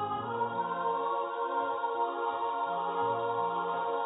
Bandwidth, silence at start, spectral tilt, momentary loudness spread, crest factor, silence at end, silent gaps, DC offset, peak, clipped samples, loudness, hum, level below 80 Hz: 3.9 kHz; 0 s; -1 dB/octave; 2 LU; 14 dB; 0 s; none; under 0.1%; -20 dBFS; under 0.1%; -32 LUFS; none; -76 dBFS